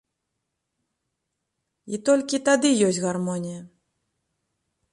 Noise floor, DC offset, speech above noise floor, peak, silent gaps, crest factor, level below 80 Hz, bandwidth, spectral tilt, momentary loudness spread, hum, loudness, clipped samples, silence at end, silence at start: -80 dBFS; under 0.1%; 58 dB; -6 dBFS; none; 20 dB; -70 dBFS; 11.5 kHz; -4.5 dB/octave; 15 LU; none; -22 LUFS; under 0.1%; 1.25 s; 1.85 s